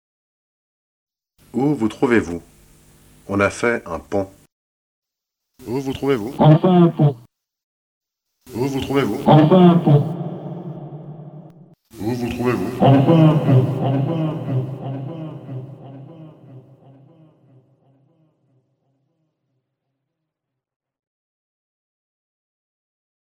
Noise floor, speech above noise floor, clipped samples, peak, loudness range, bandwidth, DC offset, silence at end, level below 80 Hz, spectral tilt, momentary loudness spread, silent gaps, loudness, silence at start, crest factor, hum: -82 dBFS; 66 dB; under 0.1%; 0 dBFS; 9 LU; 15.5 kHz; under 0.1%; 6.65 s; -52 dBFS; -8 dB/octave; 22 LU; 4.52-5.02 s, 7.63-8.01 s; -17 LUFS; 1.55 s; 20 dB; none